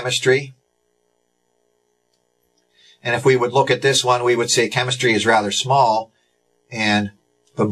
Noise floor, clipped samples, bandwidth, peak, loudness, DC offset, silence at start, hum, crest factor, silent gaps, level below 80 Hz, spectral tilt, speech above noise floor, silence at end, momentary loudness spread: -68 dBFS; under 0.1%; 13 kHz; 0 dBFS; -17 LUFS; under 0.1%; 0 s; 60 Hz at -55 dBFS; 20 dB; none; -60 dBFS; -3.5 dB/octave; 50 dB; 0 s; 14 LU